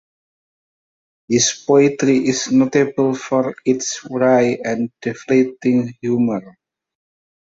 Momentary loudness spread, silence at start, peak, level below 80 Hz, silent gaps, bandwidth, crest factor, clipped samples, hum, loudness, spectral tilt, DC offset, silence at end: 8 LU; 1.3 s; -2 dBFS; -60 dBFS; none; 8 kHz; 16 dB; under 0.1%; none; -17 LUFS; -4.5 dB/octave; under 0.1%; 1.05 s